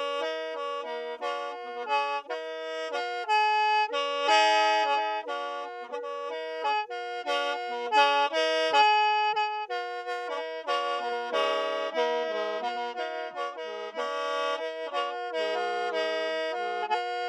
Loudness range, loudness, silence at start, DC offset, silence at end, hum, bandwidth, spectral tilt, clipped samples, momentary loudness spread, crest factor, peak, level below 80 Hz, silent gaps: 6 LU; -28 LUFS; 0 s; under 0.1%; 0 s; none; 11.5 kHz; 0 dB/octave; under 0.1%; 12 LU; 18 dB; -10 dBFS; -88 dBFS; none